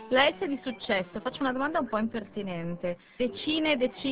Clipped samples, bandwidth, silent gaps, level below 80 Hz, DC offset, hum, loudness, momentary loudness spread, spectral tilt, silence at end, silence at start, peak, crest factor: under 0.1%; 4 kHz; none; -60 dBFS; 0.2%; none; -29 LUFS; 10 LU; -2.5 dB/octave; 0 s; 0 s; -8 dBFS; 20 dB